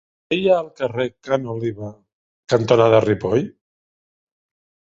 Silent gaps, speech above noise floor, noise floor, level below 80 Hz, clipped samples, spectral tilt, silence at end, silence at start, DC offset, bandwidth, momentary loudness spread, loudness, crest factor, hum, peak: 2.13-2.43 s; over 72 dB; under -90 dBFS; -54 dBFS; under 0.1%; -6.5 dB/octave; 1.45 s; 0.3 s; under 0.1%; 7.8 kHz; 13 LU; -19 LUFS; 20 dB; none; 0 dBFS